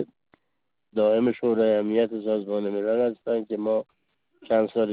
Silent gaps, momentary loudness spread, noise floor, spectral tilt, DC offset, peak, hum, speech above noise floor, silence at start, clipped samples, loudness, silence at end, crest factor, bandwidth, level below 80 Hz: none; 7 LU; -81 dBFS; -5.5 dB/octave; under 0.1%; -10 dBFS; none; 57 dB; 0 s; under 0.1%; -25 LUFS; 0 s; 16 dB; 4.8 kHz; -68 dBFS